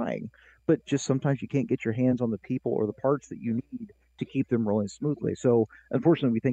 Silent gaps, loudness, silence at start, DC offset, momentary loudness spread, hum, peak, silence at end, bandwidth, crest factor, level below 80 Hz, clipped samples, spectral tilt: none; -28 LUFS; 0 s; under 0.1%; 10 LU; none; -10 dBFS; 0 s; 8.6 kHz; 18 dB; -64 dBFS; under 0.1%; -7.5 dB/octave